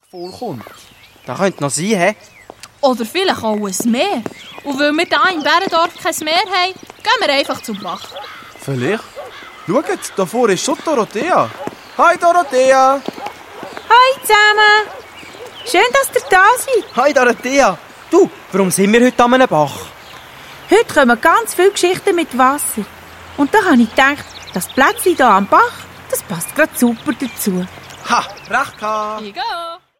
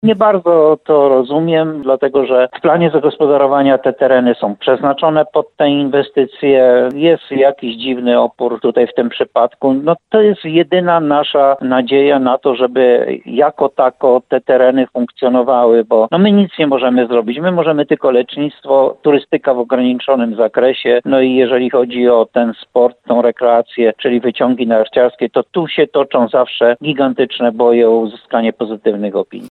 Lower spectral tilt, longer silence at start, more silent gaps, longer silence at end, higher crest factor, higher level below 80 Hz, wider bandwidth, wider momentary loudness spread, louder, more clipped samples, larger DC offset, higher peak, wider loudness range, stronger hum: second, -3.5 dB/octave vs -8.5 dB/octave; about the same, 0.15 s vs 0.05 s; neither; first, 0.25 s vs 0.05 s; about the same, 14 dB vs 12 dB; first, -52 dBFS vs -62 dBFS; first, 16.5 kHz vs 4.4 kHz; first, 19 LU vs 5 LU; about the same, -14 LUFS vs -12 LUFS; neither; neither; about the same, 0 dBFS vs 0 dBFS; first, 6 LU vs 2 LU; neither